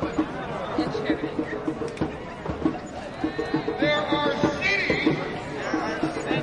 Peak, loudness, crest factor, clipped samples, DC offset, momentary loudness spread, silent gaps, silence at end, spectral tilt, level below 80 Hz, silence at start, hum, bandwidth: -8 dBFS; -26 LUFS; 18 dB; under 0.1%; under 0.1%; 9 LU; none; 0 s; -5.5 dB/octave; -48 dBFS; 0 s; none; 10.5 kHz